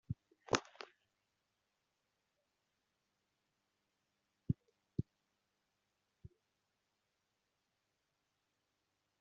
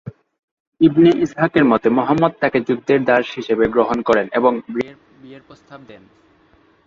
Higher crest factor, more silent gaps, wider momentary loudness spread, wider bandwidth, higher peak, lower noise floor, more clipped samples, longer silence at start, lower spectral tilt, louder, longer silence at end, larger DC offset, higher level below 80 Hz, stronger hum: first, 40 dB vs 16 dB; second, none vs 0.39-0.72 s; first, 25 LU vs 7 LU; about the same, 7.2 kHz vs 7.4 kHz; second, -12 dBFS vs -2 dBFS; first, -86 dBFS vs -54 dBFS; neither; about the same, 0.1 s vs 0.05 s; second, -4.5 dB/octave vs -7.5 dB/octave; second, -43 LUFS vs -16 LUFS; first, 2.95 s vs 0.9 s; neither; second, -72 dBFS vs -52 dBFS; neither